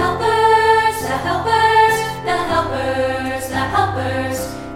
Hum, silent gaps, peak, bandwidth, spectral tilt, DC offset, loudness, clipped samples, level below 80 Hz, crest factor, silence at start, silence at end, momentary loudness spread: none; none; -2 dBFS; 16.5 kHz; -4.5 dB/octave; under 0.1%; -17 LUFS; under 0.1%; -40 dBFS; 16 dB; 0 s; 0 s; 9 LU